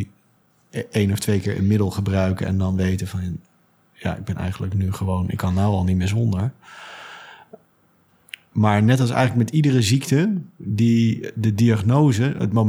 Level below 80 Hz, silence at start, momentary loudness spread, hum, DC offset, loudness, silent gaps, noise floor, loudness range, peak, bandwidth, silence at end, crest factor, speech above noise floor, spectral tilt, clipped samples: -54 dBFS; 0 s; 16 LU; none; under 0.1%; -21 LUFS; none; -59 dBFS; 6 LU; -2 dBFS; 14.5 kHz; 0 s; 18 dB; 40 dB; -7 dB/octave; under 0.1%